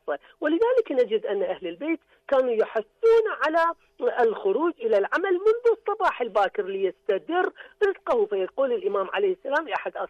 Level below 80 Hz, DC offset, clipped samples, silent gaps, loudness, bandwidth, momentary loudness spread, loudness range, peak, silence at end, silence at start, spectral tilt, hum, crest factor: -66 dBFS; under 0.1%; under 0.1%; none; -25 LUFS; 7.6 kHz; 7 LU; 3 LU; -12 dBFS; 0.05 s; 0.05 s; -5.5 dB/octave; none; 12 dB